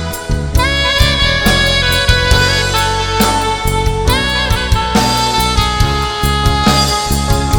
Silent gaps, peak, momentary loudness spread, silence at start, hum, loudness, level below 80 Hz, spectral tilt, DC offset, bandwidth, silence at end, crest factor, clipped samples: none; 0 dBFS; 4 LU; 0 s; none; -12 LUFS; -18 dBFS; -3.5 dB/octave; under 0.1%; 19.5 kHz; 0 s; 12 dB; under 0.1%